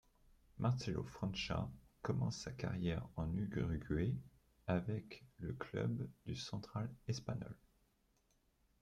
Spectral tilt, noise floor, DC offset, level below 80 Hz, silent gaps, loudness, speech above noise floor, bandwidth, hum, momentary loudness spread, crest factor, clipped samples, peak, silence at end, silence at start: -6.5 dB/octave; -78 dBFS; under 0.1%; -60 dBFS; none; -43 LUFS; 36 dB; 11 kHz; none; 8 LU; 20 dB; under 0.1%; -24 dBFS; 1.25 s; 0.55 s